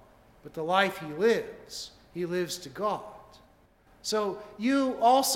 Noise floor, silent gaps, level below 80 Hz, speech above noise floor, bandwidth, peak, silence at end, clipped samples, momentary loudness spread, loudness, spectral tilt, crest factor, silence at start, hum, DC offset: -61 dBFS; none; -64 dBFS; 33 dB; 17 kHz; -8 dBFS; 0 s; under 0.1%; 16 LU; -29 LUFS; -3.5 dB/octave; 20 dB; 0.45 s; none; under 0.1%